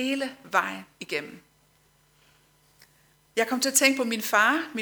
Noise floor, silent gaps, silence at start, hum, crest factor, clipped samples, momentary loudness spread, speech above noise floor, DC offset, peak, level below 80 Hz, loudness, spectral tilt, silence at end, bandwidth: -64 dBFS; none; 0 s; none; 22 dB; under 0.1%; 13 LU; 38 dB; under 0.1%; -6 dBFS; -74 dBFS; -24 LUFS; -1 dB/octave; 0 s; over 20 kHz